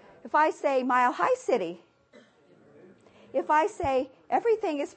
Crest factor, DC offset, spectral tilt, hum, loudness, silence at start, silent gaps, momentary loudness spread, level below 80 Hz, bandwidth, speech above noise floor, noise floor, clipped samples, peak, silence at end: 18 dB; under 0.1%; -4.5 dB/octave; none; -27 LUFS; 0.25 s; none; 8 LU; -60 dBFS; 8.8 kHz; 33 dB; -59 dBFS; under 0.1%; -10 dBFS; 0.05 s